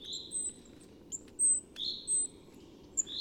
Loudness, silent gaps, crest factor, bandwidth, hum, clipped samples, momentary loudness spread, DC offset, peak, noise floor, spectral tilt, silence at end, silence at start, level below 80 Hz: -32 LUFS; none; 16 dB; 17.5 kHz; none; under 0.1%; 17 LU; under 0.1%; -20 dBFS; -55 dBFS; 0.5 dB/octave; 0 s; 0 s; -66 dBFS